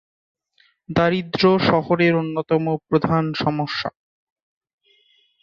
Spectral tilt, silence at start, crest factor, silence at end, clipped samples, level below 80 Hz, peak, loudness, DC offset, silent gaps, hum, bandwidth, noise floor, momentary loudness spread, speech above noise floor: -7.5 dB/octave; 0.9 s; 18 dB; 1.55 s; under 0.1%; -52 dBFS; -4 dBFS; -20 LUFS; under 0.1%; none; none; 7 kHz; -61 dBFS; 8 LU; 42 dB